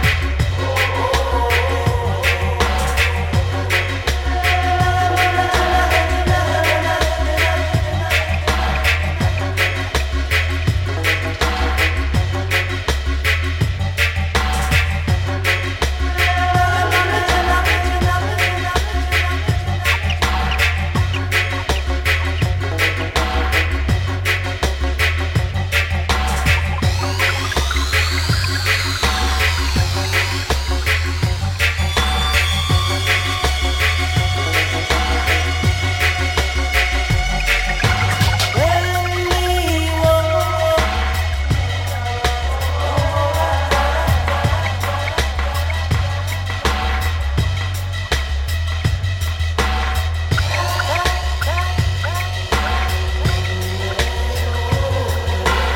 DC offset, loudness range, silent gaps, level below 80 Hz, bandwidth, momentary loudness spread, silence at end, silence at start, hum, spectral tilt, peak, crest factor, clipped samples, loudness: under 0.1%; 3 LU; none; -22 dBFS; 17 kHz; 4 LU; 0 s; 0 s; none; -4.5 dB/octave; -2 dBFS; 16 dB; under 0.1%; -18 LUFS